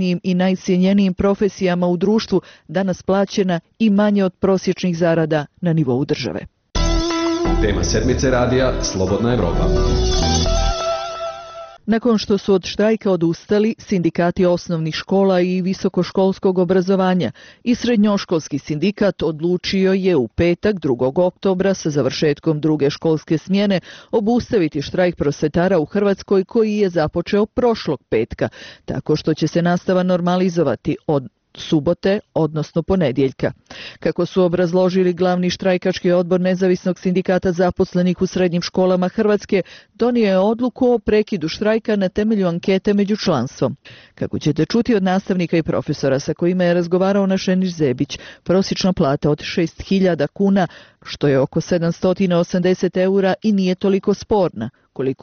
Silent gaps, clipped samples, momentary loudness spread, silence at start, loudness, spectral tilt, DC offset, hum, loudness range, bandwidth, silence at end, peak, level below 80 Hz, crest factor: none; under 0.1%; 6 LU; 0 s; -18 LUFS; -6 dB/octave; under 0.1%; none; 2 LU; 6.8 kHz; 0.1 s; -6 dBFS; -32 dBFS; 12 dB